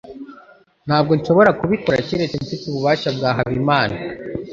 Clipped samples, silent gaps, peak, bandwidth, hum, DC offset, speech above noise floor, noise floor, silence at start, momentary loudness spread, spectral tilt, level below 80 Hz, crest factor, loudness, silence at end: under 0.1%; none; -2 dBFS; 7.6 kHz; none; under 0.1%; 30 dB; -48 dBFS; 0.05 s; 16 LU; -7 dB/octave; -48 dBFS; 18 dB; -18 LUFS; 0 s